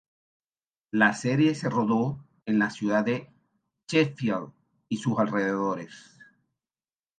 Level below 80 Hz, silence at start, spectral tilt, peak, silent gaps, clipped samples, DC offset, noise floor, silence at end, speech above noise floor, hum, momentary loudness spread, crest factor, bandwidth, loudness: -70 dBFS; 0.95 s; -6 dB/octave; -8 dBFS; none; under 0.1%; under 0.1%; under -90 dBFS; 1.2 s; over 64 dB; none; 11 LU; 20 dB; 9.4 kHz; -26 LUFS